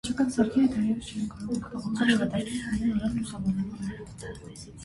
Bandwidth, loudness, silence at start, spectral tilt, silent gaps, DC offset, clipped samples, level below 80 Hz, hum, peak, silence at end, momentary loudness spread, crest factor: 11.5 kHz; -28 LUFS; 0.05 s; -5.5 dB/octave; none; under 0.1%; under 0.1%; -50 dBFS; none; -10 dBFS; 0 s; 16 LU; 18 dB